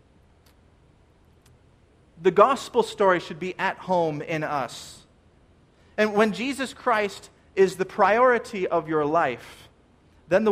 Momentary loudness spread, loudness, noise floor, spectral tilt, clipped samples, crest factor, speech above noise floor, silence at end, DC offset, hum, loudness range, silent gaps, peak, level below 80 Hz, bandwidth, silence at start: 14 LU; -23 LUFS; -58 dBFS; -5 dB/octave; under 0.1%; 22 dB; 34 dB; 0 s; under 0.1%; none; 4 LU; none; -4 dBFS; -60 dBFS; 15 kHz; 2.2 s